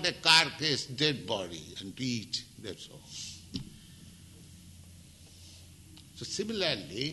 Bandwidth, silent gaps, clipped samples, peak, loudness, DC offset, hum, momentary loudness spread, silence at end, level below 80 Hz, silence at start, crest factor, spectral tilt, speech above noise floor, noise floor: 12 kHz; none; under 0.1%; -6 dBFS; -29 LUFS; under 0.1%; none; 29 LU; 0 s; -62 dBFS; 0 s; 28 dB; -2.5 dB/octave; 21 dB; -53 dBFS